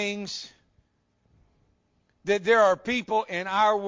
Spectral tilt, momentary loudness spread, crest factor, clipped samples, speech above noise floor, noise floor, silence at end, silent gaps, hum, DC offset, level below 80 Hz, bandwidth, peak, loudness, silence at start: -3.5 dB/octave; 17 LU; 18 dB; under 0.1%; 45 dB; -70 dBFS; 0 s; none; none; under 0.1%; -66 dBFS; 7.6 kHz; -8 dBFS; -24 LUFS; 0 s